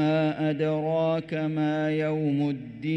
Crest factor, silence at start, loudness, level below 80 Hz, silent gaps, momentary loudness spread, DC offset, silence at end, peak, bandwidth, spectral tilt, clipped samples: 10 dB; 0 s; -27 LUFS; -64 dBFS; none; 4 LU; under 0.1%; 0 s; -14 dBFS; 6.2 kHz; -8.5 dB/octave; under 0.1%